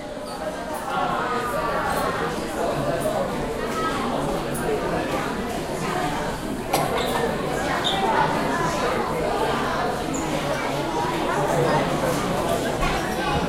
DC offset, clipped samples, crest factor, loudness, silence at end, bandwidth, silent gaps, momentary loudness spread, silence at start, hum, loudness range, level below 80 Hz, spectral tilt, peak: under 0.1%; under 0.1%; 18 dB; -24 LUFS; 0 s; 16 kHz; none; 6 LU; 0 s; none; 2 LU; -40 dBFS; -4.5 dB/octave; -6 dBFS